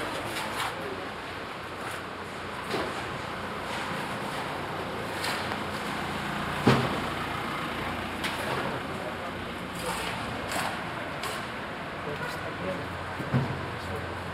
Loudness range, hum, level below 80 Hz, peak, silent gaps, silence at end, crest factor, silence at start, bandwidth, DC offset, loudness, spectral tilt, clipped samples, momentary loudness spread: 4 LU; none; -54 dBFS; -8 dBFS; none; 0 s; 24 dB; 0 s; 16 kHz; under 0.1%; -32 LUFS; -4.5 dB/octave; under 0.1%; 6 LU